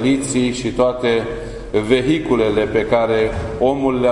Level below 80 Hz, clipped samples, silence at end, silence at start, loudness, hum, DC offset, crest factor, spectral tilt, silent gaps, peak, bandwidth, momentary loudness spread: -36 dBFS; under 0.1%; 0 s; 0 s; -17 LUFS; none; under 0.1%; 16 dB; -5.5 dB/octave; none; -2 dBFS; 11 kHz; 5 LU